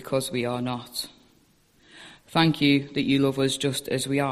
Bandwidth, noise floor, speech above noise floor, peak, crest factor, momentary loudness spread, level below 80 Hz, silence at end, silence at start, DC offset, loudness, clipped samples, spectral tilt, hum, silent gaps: 14.5 kHz; -61 dBFS; 37 dB; -6 dBFS; 20 dB; 10 LU; -60 dBFS; 0 s; 0 s; under 0.1%; -25 LUFS; under 0.1%; -5 dB/octave; none; none